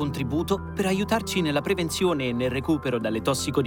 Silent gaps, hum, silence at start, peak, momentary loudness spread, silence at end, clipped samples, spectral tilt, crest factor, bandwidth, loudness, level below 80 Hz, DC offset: none; none; 0 s; -10 dBFS; 3 LU; 0 s; under 0.1%; -5 dB/octave; 16 dB; 19.5 kHz; -25 LUFS; -46 dBFS; under 0.1%